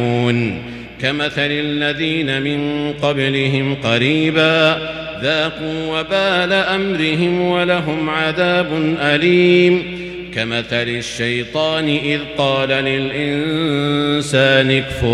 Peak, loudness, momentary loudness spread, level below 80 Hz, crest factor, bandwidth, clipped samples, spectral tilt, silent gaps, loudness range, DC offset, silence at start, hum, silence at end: 0 dBFS; -16 LUFS; 8 LU; -44 dBFS; 16 dB; 12 kHz; under 0.1%; -5.5 dB/octave; none; 3 LU; under 0.1%; 0 s; none; 0 s